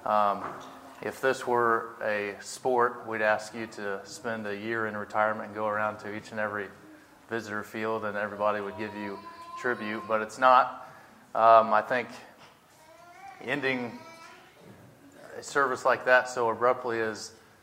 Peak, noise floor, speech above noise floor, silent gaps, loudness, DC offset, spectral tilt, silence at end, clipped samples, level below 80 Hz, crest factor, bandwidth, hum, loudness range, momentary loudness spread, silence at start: -6 dBFS; -56 dBFS; 28 dB; none; -28 LUFS; under 0.1%; -4.5 dB/octave; 0.3 s; under 0.1%; -76 dBFS; 22 dB; 16 kHz; none; 8 LU; 19 LU; 0 s